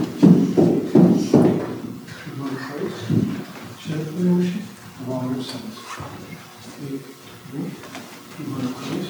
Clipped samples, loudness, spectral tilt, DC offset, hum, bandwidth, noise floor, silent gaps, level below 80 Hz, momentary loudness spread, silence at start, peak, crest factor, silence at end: under 0.1%; -21 LUFS; -7.5 dB/octave; under 0.1%; none; over 20 kHz; -40 dBFS; none; -60 dBFS; 21 LU; 0 s; -2 dBFS; 20 dB; 0 s